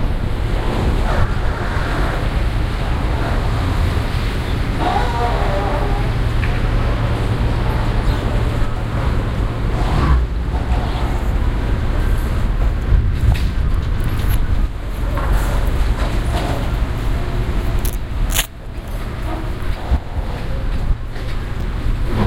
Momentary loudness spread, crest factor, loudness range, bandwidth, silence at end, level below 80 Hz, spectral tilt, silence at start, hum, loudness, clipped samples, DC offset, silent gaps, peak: 7 LU; 16 dB; 4 LU; 16.5 kHz; 0 s; -18 dBFS; -6 dB/octave; 0 s; none; -20 LUFS; under 0.1%; under 0.1%; none; 0 dBFS